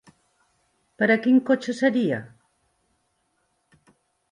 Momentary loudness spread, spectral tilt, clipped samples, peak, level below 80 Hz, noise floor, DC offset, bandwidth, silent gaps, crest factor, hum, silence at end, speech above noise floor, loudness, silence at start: 7 LU; -6 dB/octave; under 0.1%; -6 dBFS; -72 dBFS; -71 dBFS; under 0.1%; 10 kHz; none; 20 dB; none; 2.05 s; 50 dB; -22 LUFS; 1 s